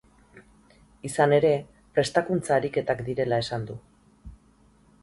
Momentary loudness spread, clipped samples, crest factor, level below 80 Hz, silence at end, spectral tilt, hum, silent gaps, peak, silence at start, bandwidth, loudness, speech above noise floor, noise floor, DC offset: 13 LU; under 0.1%; 20 dB; -56 dBFS; 0.7 s; -5.5 dB/octave; none; none; -6 dBFS; 0.35 s; 11.5 kHz; -25 LUFS; 35 dB; -59 dBFS; under 0.1%